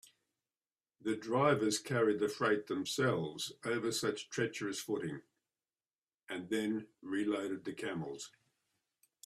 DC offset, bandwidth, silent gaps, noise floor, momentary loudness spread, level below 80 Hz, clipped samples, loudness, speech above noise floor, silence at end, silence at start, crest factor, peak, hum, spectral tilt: under 0.1%; 14.5 kHz; 5.95-6.02 s, 6.14-6.18 s; under -90 dBFS; 12 LU; -78 dBFS; under 0.1%; -36 LUFS; over 54 dB; 1 s; 1.05 s; 22 dB; -16 dBFS; none; -4.5 dB/octave